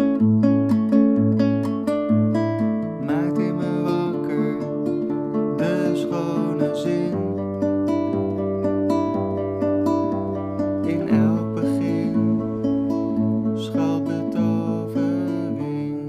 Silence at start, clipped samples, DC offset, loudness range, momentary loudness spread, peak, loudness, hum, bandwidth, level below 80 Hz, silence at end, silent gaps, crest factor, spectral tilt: 0 s; under 0.1%; under 0.1%; 3 LU; 6 LU; -6 dBFS; -22 LUFS; none; 10.5 kHz; -56 dBFS; 0 s; none; 14 dB; -8.5 dB/octave